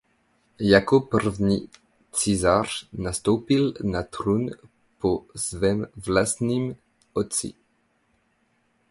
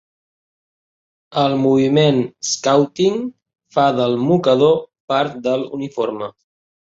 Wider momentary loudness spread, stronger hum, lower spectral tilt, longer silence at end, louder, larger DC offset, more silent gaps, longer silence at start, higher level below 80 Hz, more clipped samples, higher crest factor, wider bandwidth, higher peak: about the same, 11 LU vs 11 LU; neither; about the same, -5 dB/octave vs -5.5 dB/octave; first, 1.4 s vs 0.65 s; second, -24 LUFS vs -17 LUFS; neither; second, none vs 5.00-5.08 s; second, 0.6 s vs 1.3 s; first, -48 dBFS vs -60 dBFS; neither; first, 22 dB vs 16 dB; first, 11.5 kHz vs 8 kHz; about the same, -4 dBFS vs -2 dBFS